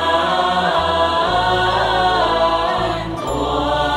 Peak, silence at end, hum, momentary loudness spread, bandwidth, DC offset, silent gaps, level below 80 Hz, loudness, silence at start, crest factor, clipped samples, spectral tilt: -2 dBFS; 0 s; none; 5 LU; 16 kHz; under 0.1%; none; -34 dBFS; -17 LUFS; 0 s; 14 dB; under 0.1%; -4.5 dB/octave